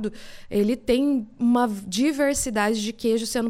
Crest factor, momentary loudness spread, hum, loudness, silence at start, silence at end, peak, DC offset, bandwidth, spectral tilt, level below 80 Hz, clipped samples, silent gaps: 14 dB; 4 LU; none; -23 LUFS; 0 s; 0 s; -8 dBFS; under 0.1%; 16.5 kHz; -4 dB/octave; -48 dBFS; under 0.1%; none